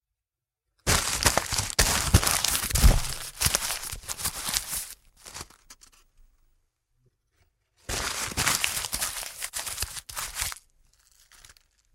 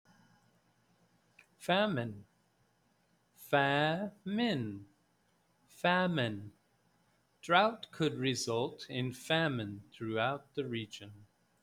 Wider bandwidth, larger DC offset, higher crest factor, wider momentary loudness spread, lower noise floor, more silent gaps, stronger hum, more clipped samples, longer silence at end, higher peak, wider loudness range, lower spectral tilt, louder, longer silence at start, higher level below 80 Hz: about the same, 16.5 kHz vs 17 kHz; neither; about the same, 28 dB vs 24 dB; about the same, 18 LU vs 16 LU; first, -89 dBFS vs -74 dBFS; neither; neither; neither; first, 1.4 s vs 0.4 s; first, 0 dBFS vs -12 dBFS; first, 13 LU vs 3 LU; second, -2 dB/octave vs -5 dB/octave; first, -26 LUFS vs -34 LUFS; second, 0.85 s vs 1.6 s; first, -34 dBFS vs -76 dBFS